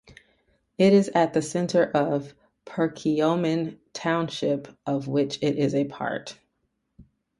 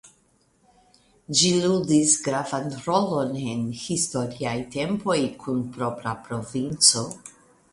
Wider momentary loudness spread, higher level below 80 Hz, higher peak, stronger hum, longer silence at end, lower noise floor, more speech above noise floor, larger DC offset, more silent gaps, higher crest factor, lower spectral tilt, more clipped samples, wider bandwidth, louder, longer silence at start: about the same, 12 LU vs 12 LU; second, -64 dBFS vs -58 dBFS; second, -8 dBFS vs -2 dBFS; neither; about the same, 0.4 s vs 0.4 s; first, -75 dBFS vs -64 dBFS; first, 52 dB vs 39 dB; neither; neither; second, 18 dB vs 24 dB; first, -6 dB/octave vs -3.5 dB/octave; neither; about the same, 11.5 kHz vs 11.5 kHz; about the same, -25 LUFS vs -23 LUFS; first, 0.8 s vs 0.05 s